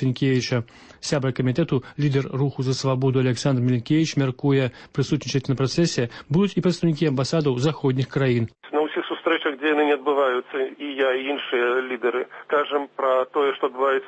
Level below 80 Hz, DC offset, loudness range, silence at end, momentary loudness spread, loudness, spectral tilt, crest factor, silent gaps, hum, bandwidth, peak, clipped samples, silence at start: -58 dBFS; under 0.1%; 1 LU; 0 s; 5 LU; -23 LUFS; -6 dB/octave; 14 dB; none; none; 8.6 kHz; -8 dBFS; under 0.1%; 0 s